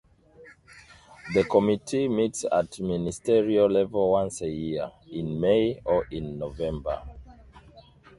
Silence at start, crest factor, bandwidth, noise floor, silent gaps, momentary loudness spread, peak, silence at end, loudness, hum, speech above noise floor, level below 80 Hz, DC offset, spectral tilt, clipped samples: 0.4 s; 20 dB; 11.5 kHz; -53 dBFS; none; 13 LU; -6 dBFS; 0.4 s; -26 LUFS; none; 27 dB; -50 dBFS; under 0.1%; -6 dB/octave; under 0.1%